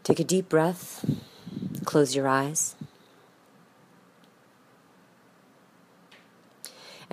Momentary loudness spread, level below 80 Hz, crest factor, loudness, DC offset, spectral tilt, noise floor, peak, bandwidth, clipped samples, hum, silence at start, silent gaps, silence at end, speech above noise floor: 22 LU; -68 dBFS; 24 dB; -26 LUFS; under 0.1%; -4.5 dB/octave; -59 dBFS; -6 dBFS; 15.5 kHz; under 0.1%; none; 0.05 s; none; 0.1 s; 34 dB